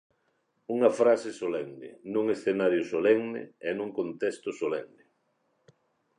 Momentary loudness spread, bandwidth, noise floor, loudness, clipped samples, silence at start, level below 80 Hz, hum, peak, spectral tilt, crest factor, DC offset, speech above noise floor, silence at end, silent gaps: 12 LU; 10.5 kHz; -74 dBFS; -28 LUFS; under 0.1%; 0.7 s; -76 dBFS; none; -8 dBFS; -6 dB/octave; 20 dB; under 0.1%; 46 dB; 1.35 s; none